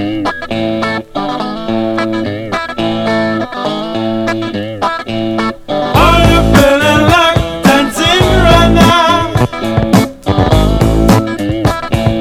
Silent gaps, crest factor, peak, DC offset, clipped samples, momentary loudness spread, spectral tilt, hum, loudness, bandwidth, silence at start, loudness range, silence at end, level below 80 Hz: none; 10 dB; 0 dBFS; under 0.1%; 0.6%; 10 LU; -5.5 dB/octave; none; -11 LUFS; 16.5 kHz; 0 s; 8 LU; 0 s; -22 dBFS